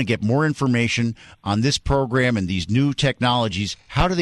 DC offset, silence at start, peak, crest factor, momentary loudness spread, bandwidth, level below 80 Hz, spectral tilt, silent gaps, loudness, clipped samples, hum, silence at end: under 0.1%; 0 s; -6 dBFS; 14 dB; 6 LU; 11.5 kHz; -36 dBFS; -5.5 dB/octave; none; -21 LUFS; under 0.1%; none; 0 s